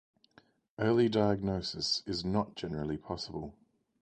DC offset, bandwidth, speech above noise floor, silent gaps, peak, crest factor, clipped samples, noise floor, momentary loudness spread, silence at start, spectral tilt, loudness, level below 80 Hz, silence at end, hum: under 0.1%; 9.6 kHz; 33 dB; none; -14 dBFS; 20 dB; under 0.1%; -66 dBFS; 12 LU; 0.8 s; -5.5 dB/octave; -32 LUFS; -56 dBFS; 0.5 s; none